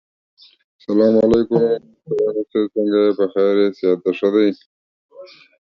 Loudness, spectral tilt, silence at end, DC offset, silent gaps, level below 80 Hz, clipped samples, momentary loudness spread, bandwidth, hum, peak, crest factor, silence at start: -17 LUFS; -8 dB/octave; 0.35 s; under 0.1%; 4.66-5.09 s; -52 dBFS; under 0.1%; 7 LU; 6.8 kHz; none; -2 dBFS; 16 dB; 0.9 s